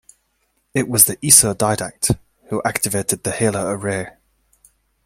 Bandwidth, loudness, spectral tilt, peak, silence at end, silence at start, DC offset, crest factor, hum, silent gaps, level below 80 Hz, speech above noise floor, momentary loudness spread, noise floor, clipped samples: 16.5 kHz; -17 LUFS; -3 dB/octave; 0 dBFS; 0.95 s; 0.75 s; under 0.1%; 20 dB; none; none; -48 dBFS; 49 dB; 14 LU; -67 dBFS; under 0.1%